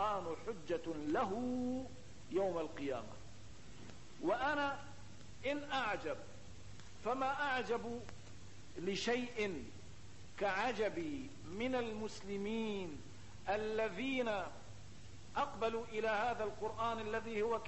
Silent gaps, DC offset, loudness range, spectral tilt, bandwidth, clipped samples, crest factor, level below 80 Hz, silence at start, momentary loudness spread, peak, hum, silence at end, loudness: none; 0.3%; 2 LU; -5 dB/octave; 8.2 kHz; under 0.1%; 18 dB; -64 dBFS; 0 s; 19 LU; -24 dBFS; none; 0 s; -40 LUFS